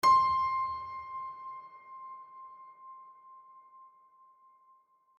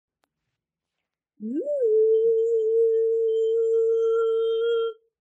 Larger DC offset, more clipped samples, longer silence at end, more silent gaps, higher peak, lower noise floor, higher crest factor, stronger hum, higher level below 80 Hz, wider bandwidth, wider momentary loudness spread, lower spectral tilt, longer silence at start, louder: neither; neither; first, 1.35 s vs 0.3 s; neither; about the same, -16 dBFS vs -14 dBFS; second, -66 dBFS vs -85 dBFS; first, 18 dB vs 8 dB; neither; first, -68 dBFS vs under -90 dBFS; first, 12 kHz vs 3.8 kHz; first, 27 LU vs 9 LU; second, -2.5 dB/octave vs -6 dB/octave; second, 0.05 s vs 1.4 s; second, -31 LUFS vs -23 LUFS